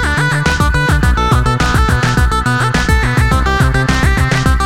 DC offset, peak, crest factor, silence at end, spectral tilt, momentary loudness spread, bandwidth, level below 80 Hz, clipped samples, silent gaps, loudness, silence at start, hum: 2%; 0 dBFS; 12 dB; 0 s; -5 dB/octave; 1 LU; 16 kHz; -16 dBFS; under 0.1%; none; -12 LUFS; 0 s; none